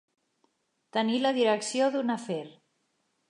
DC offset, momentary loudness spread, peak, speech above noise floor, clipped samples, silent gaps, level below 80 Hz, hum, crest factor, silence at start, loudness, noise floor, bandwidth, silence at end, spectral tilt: under 0.1%; 11 LU; -12 dBFS; 48 dB; under 0.1%; none; -86 dBFS; none; 18 dB; 0.95 s; -28 LUFS; -75 dBFS; 11 kHz; 0.8 s; -4 dB/octave